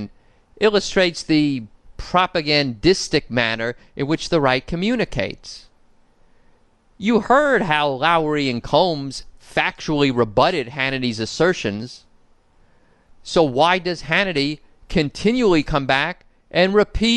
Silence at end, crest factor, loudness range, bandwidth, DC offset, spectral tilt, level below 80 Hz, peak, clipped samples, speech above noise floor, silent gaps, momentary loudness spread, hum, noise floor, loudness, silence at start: 0 s; 18 dB; 4 LU; 11.5 kHz; under 0.1%; -5 dB/octave; -40 dBFS; -2 dBFS; under 0.1%; 36 dB; none; 11 LU; none; -55 dBFS; -19 LUFS; 0 s